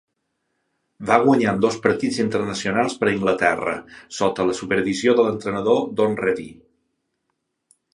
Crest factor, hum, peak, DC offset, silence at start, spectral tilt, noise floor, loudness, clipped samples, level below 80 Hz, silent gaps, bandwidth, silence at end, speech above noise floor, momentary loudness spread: 20 dB; none; 0 dBFS; under 0.1%; 1 s; -5 dB/octave; -75 dBFS; -20 LUFS; under 0.1%; -56 dBFS; none; 11 kHz; 1.4 s; 55 dB; 8 LU